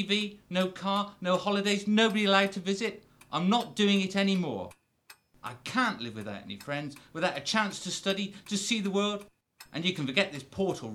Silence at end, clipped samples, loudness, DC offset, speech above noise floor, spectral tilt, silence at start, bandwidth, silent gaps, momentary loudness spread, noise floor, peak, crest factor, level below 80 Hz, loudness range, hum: 0 s; under 0.1%; -29 LUFS; under 0.1%; 29 dB; -4.5 dB/octave; 0 s; 14 kHz; none; 15 LU; -59 dBFS; -8 dBFS; 22 dB; -68 dBFS; 6 LU; none